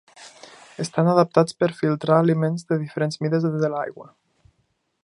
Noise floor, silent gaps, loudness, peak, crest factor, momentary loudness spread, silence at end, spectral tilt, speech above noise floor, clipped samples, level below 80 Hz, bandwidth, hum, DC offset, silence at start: -70 dBFS; none; -22 LUFS; -2 dBFS; 22 dB; 14 LU; 1 s; -7 dB/octave; 49 dB; under 0.1%; -68 dBFS; 11 kHz; none; under 0.1%; 0.2 s